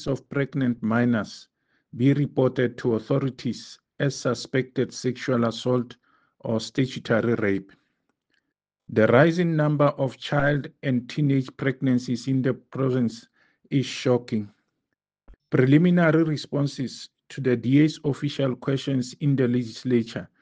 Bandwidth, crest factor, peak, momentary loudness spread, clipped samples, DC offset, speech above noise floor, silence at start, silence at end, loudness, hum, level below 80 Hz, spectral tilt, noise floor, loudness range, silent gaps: 9.2 kHz; 20 dB; -4 dBFS; 11 LU; under 0.1%; under 0.1%; 58 dB; 0 s; 0.15 s; -24 LUFS; none; -58 dBFS; -7 dB/octave; -82 dBFS; 5 LU; none